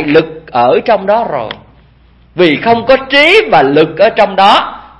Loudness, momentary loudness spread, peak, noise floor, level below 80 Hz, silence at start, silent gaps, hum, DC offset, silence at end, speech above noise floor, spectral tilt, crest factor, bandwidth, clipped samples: -9 LUFS; 11 LU; 0 dBFS; -44 dBFS; -42 dBFS; 0 s; none; none; under 0.1%; 0.2 s; 35 dB; -5.5 dB/octave; 10 dB; 11 kHz; 0.7%